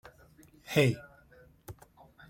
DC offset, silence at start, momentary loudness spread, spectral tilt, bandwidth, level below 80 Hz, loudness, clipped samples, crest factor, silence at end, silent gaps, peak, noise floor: under 0.1%; 0.7 s; 26 LU; -6 dB/octave; 16.5 kHz; -62 dBFS; -29 LUFS; under 0.1%; 24 dB; 0.55 s; none; -10 dBFS; -59 dBFS